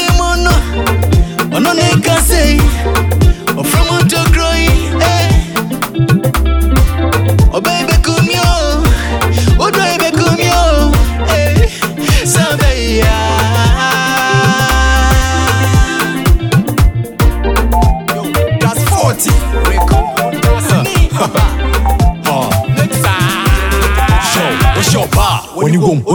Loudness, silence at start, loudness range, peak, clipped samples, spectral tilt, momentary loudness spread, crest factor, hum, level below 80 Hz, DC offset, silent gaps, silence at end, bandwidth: -11 LUFS; 0 s; 2 LU; 0 dBFS; under 0.1%; -5 dB/octave; 3 LU; 10 dB; none; -14 dBFS; under 0.1%; none; 0 s; over 20 kHz